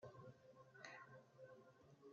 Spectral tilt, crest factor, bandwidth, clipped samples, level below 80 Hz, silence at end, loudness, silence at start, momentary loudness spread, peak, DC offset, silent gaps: -4 dB/octave; 26 dB; 7.2 kHz; under 0.1%; under -90 dBFS; 0 s; -63 LUFS; 0 s; 8 LU; -36 dBFS; under 0.1%; none